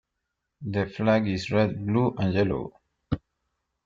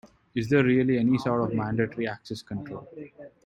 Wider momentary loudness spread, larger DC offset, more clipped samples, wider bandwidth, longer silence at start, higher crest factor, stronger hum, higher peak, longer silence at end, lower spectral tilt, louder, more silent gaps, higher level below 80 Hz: second, 10 LU vs 18 LU; neither; neither; second, 7.6 kHz vs 10.5 kHz; first, 0.6 s vs 0.35 s; about the same, 18 dB vs 18 dB; neither; about the same, -10 dBFS vs -10 dBFS; first, 0.65 s vs 0.15 s; about the same, -7.5 dB/octave vs -8 dB/octave; about the same, -26 LUFS vs -26 LUFS; neither; first, -52 dBFS vs -58 dBFS